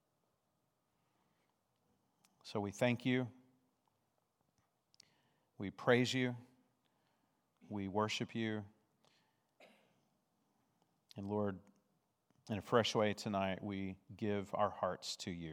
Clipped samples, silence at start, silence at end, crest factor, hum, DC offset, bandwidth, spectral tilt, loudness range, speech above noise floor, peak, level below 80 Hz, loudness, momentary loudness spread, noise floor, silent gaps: under 0.1%; 2.45 s; 0 s; 26 dB; none; under 0.1%; 16 kHz; -5 dB/octave; 9 LU; 45 dB; -16 dBFS; -84 dBFS; -39 LUFS; 15 LU; -83 dBFS; none